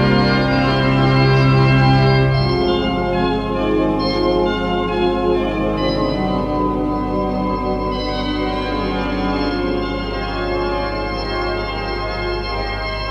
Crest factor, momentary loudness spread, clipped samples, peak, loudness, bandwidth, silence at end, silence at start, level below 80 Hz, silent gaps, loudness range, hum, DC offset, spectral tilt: 14 dB; 9 LU; under 0.1%; -2 dBFS; -18 LUFS; 7.2 kHz; 0 s; 0 s; -28 dBFS; none; 6 LU; none; under 0.1%; -7.5 dB/octave